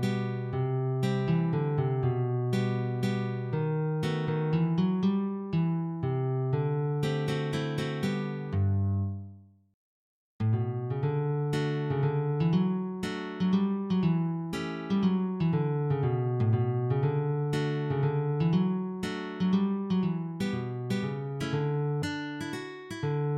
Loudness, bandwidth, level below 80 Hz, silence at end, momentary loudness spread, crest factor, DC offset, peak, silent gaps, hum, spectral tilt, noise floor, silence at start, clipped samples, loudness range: -30 LUFS; 11.5 kHz; -64 dBFS; 0 s; 6 LU; 14 dB; under 0.1%; -14 dBFS; 9.74-10.39 s; none; -8 dB/octave; -51 dBFS; 0 s; under 0.1%; 3 LU